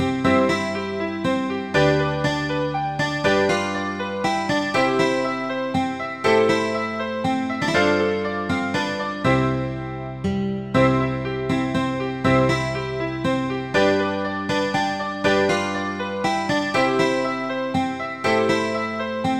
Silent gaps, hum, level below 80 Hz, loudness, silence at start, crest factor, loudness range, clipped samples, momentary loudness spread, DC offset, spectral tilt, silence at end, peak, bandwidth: none; none; -48 dBFS; -22 LUFS; 0 s; 16 dB; 1 LU; under 0.1%; 7 LU; 0.2%; -5.5 dB/octave; 0 s; -4 dBFS; 12.5 kHz